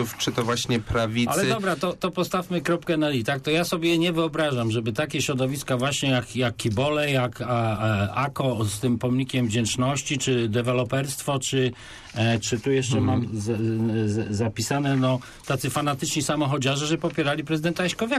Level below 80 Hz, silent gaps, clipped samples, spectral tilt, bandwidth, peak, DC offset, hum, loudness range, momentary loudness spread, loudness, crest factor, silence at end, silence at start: -50 dBFS; none; under 0.1%; -5 dB/octave; 14 kHz; -12 dBFS; under 0.1%; none; 1 LU; 4 LU; -24 LUFS; 12 dB; 0 s; 0 s